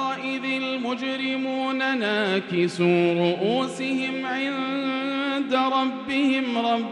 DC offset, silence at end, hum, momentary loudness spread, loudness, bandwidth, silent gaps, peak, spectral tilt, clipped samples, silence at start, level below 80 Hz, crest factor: under 0.1%; 0 s; none; 5 LU; -24 LUFS; 11 kHz; none; -8 dBFS; -5.5 dB/octave; under 0.1%; 0 s; -72 dBFS; 16 dB